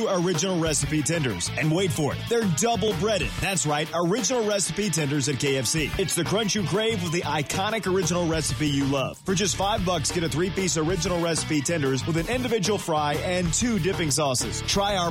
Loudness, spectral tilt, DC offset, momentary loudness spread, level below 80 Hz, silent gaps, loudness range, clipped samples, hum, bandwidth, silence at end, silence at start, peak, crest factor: -24 LUFS; -4 dB/octave; under 0.1%; 2 LU; -42 dBFS; none; 1 LU; under 0.1%; none; 16.5 kHz; 0 s; 0 s; -12 dBFS; 14 dB